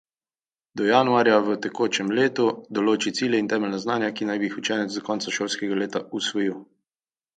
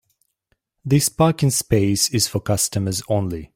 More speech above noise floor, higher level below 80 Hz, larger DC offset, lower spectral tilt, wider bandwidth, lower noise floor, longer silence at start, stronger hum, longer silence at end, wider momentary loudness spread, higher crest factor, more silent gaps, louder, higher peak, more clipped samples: first, over 67 dB vs 51 dB; second, -72 dBFS vs -46 dBFS; neither; about the same, -4 dB/octave vs -4.5 dB/octave; second, 9.4 kHz vs 16.5 kHz; first, under -90 dBFS vs -70 dBFS; about the same, 0.75 s vs 0.85 s; neither; first, 0.75 s vs 0.1 s; first, 9 LU vs 6 LU; about the same, 20 dB vs 16 dB; neither; second, -24 LUFS vs -19 LUFS; about the same, -4 dBFS vs -4 dBFS; neither